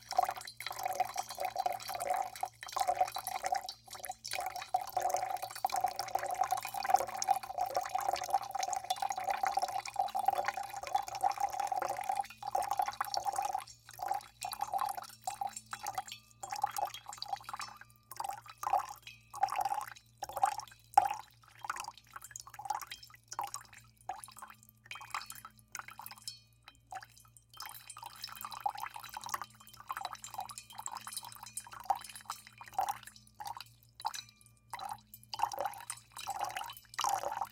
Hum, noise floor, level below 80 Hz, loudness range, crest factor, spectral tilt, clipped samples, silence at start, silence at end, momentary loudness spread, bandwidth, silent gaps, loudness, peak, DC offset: none; -62 dBFS; -72 dBFS; 10 LU; 28 dB; -1 dB/octave; under 0.1%; 0 s; 0.05 s; 14 LU; 17 kHz; none; -38 LUFS; -10 dBFS; under 0.1%